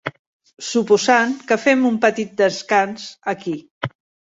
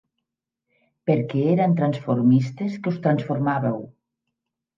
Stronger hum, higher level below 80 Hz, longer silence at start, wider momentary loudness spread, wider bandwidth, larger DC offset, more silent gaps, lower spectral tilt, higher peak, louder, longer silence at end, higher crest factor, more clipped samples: neither; first, -62 dBFS vs -68 dBFS; second, 0.05 s vs 1.05 s; first, 15 LU vs 9 LU; first, 8 kHz vs 7.2 kHz; neither; first, 0.19-0.40 s, 3.71-3.81 s vs none; second, -4 dB/octave vs -9.5 dB/octave; first, -2 dBFS vs -6 dBFS; first, -18 LUFS vs -22 LUFS; second, 0.35 s vs 0.85 s; about the same, 18 dB vs 16 dB; neither